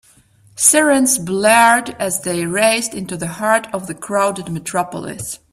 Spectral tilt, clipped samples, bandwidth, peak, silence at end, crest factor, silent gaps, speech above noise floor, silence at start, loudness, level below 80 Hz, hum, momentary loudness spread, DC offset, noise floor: -3 dB/octave; under 0.1%; 16 kHz; 0 dBFS; 0.15 s; 16 dB; none; 34 dB; 0.55 s; -15 LUFS; -54 dBFS; none; 14 LU; under 0.1%; -51 dBFS